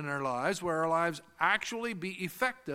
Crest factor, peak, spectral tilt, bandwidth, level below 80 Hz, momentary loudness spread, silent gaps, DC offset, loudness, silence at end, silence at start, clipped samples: 20 dB; -12 dBFS; -4 dB/octave; 16.5 kHz; -70 dBFS; 7 LU; none; under 0.1%; -32 LUFS; 0 s; 0 s; under 0.1%